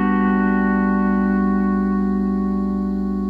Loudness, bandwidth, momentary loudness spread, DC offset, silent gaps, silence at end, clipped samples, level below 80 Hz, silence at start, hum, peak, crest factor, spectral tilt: -19 LUFS; 4.5 kHz; 4 LU; under 0.1%; none; 0 s; under 0.1%; -36 dBFS; 0 s; 60 Hz at -35 dBFS; -6 dBFS; 12 dB; -10.5 dB/octave